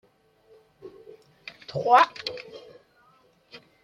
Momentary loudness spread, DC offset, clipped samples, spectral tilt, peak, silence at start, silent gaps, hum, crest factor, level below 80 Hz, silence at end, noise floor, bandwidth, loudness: 28 LU; under 0.1%; under 0.1%; -4 dB/octave; -4 dBFS; 0.85 s; none; none; 24 dB; -72 dBFS; 1.25 s; -61 dBFS; 13 kHz; -23 LUFS